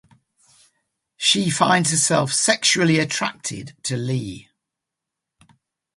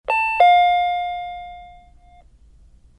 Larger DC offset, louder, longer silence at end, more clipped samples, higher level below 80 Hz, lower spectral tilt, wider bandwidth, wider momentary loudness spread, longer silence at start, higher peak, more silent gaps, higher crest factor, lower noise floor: neither; about the same, -19 LUFS vs -17 LUFS; first, 1.55 s vs 1.3 s; neither; second, -60 dBFS vs -50 dBFS; about the same, -3 dB/octave vs -2 dB/octave; about the same, 11.5 kHz vs 10.5 kHz; second, 13 LU vs 21 LU; first, 1.2 s vs 0.1 s; about the same, -2 dBFS vs -2 dBFS; neither; about the same, 20 dB vs 18 dB; first, -84 dBFS vs -49 dBFS